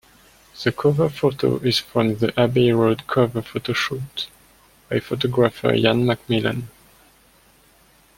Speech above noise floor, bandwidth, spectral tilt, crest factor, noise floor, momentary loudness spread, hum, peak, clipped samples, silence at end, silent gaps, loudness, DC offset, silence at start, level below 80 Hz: 35 dB; 16.5 kHz; -6.5 dB/octave; 20 dB; -55 dBFS; 10 LU; none; -2 dBFS; under 0.1%; 1.5 s; none; -21 LUFS; under 0.1%; 0.55 s; -52 dBFS